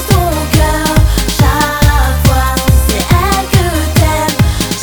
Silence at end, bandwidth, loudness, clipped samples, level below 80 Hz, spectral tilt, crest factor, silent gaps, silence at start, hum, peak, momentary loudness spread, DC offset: 0 s; over 20 kHz; -11 LUFS; 0.4%; -14 dBFS; -5 dB/octave; 10 dB; none; 0 s; none; 0 dBFS; 2 LU; under 0.1%